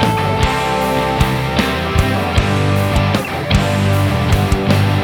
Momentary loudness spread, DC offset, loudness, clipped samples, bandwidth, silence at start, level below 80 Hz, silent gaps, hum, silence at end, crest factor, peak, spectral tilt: 2 LU; under 0.1%; -15 LUFS; under 0.1%; 18 kHz; 0 s; -24 dBFS; none; none; 0 s; 14 dB; 0 dBFS; -6 dB/octave